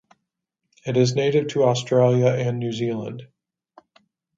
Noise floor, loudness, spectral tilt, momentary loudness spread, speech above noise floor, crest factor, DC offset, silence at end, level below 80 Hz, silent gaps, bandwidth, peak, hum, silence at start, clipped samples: -80 dBFS; -21 LUFS; -6.5 dB/octave; 14 LU; 60 dB; 18 dB; under 0.1%; 1.1 s; -64 dBFS; none; 7.8 kHz; -4 dBFS; none; 0.85 s; under 0.1%